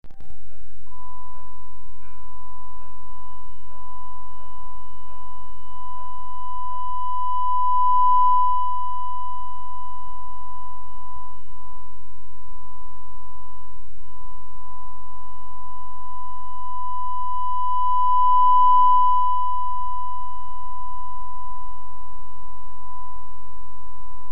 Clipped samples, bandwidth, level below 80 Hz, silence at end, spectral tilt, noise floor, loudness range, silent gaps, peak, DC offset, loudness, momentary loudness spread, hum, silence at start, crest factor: under 0.1%; 3.2 kHz; -48 dBFS; 0 s; -6.5 dB/octave; -49 dBFS; 24 LU; none; -6 dBFS; 20%; -23 LUFS; 26 LU; none; 0 s; 16 dB